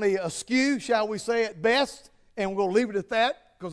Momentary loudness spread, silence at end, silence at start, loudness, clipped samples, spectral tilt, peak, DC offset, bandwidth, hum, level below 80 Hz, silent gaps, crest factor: 7 LU; 0 s; 0 s; -26 LUFS; under 0.1%; -4 dB/octave; -10 dBFS; under 0.1%; 11 kHz; none; -62 dBFS; none; 16 dB